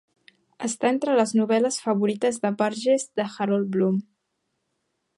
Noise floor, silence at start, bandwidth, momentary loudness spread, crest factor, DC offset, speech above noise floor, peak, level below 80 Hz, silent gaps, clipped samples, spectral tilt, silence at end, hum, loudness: -77 dBFS; 0.6 s; 11.5 kHz; 7 LU; 16 dB; under 0.1%; 54 dB; -8 dBFS; -76 dBFS; none; under 0.1%; -5 dB/octave; 1.15 s; none; -24 LUFS